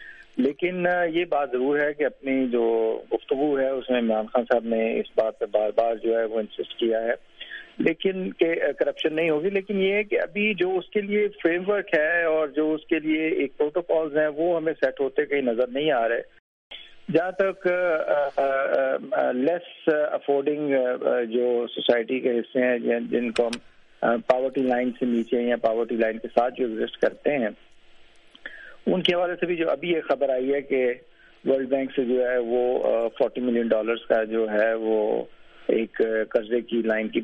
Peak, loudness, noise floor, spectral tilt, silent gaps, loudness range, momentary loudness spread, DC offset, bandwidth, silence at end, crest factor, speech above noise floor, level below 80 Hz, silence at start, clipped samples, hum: -4 dBFS; -24 LUFS; -50 dBFS; -6.5 dB/octave; 16.40-16.70 s; 2 LU; 4 LU; under 0.1%; 9.4 kHz; 0 s; 20 dB; 27 dB; -62 dBFS; 0 s; under 0.1%; none